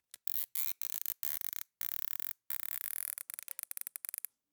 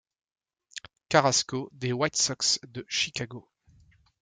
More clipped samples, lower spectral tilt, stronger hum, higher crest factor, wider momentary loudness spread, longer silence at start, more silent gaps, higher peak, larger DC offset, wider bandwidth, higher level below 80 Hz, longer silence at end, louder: neither; second, 3.5 dB/octave vs -2.5 dB/octave; neither; first, 30 dB vs 24 dB; second, 8 LU vs 20 LU; second, 0.25 s vs 0.75 s; neither; second, -10 dBFS vs -6 dBFS; neither; first, over 20 kHz vs 11 kHz; second, under -90 dBFS vs -66 dBFS; first, 1.4 s vs 0.8 s; second, -36 LUFS vs -26 LUFS